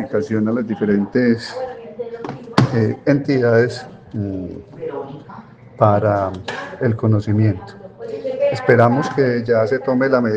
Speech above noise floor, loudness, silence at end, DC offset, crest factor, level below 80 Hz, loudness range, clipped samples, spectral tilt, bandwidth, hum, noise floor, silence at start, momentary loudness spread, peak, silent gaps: 22 dB; -18 LUFS; 0 s; under 0.1%; 18 dB; -56 dBFS; 3 LU; under 0.1%; -8 dB/octave; 8.8 kHz; none; -39 dBFS; 0 s; 16 LU; 0 dBFS; none